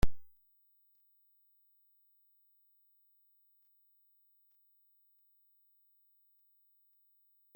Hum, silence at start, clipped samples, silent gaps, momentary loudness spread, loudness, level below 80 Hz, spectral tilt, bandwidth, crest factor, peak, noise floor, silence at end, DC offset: 50 Hz at -115 dBFS; 0.05 s; under 0.1%; none; 0 LU; -59 LUFS; -50 dBFS; -6 dB/octave; 16.5 kHz; 24 dB; -14 dBFS; -71 dBFS; 7.35 s; under 0.1%